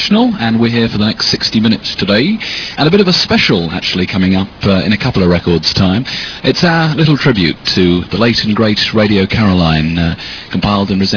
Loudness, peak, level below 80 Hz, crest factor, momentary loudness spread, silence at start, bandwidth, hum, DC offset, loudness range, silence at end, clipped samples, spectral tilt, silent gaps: -11 LUFS; 0 dBFS; -34 dBFS; 12 dB; 5 LU; 0 s; 5.4 kHz; none; under 0.1%; 1 LU; 0 s; 0.2%; -6 dB/octave; none